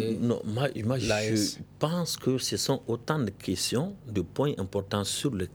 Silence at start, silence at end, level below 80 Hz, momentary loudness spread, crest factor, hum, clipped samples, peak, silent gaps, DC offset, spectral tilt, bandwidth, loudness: 0 s; 0 s; -58 dBFS; 4 LU; 20 dB; none; under 0.1%; -10 dBFS; none; under 0.1%; -4.5 dB/octave; over 20 kHz; -29 LUFS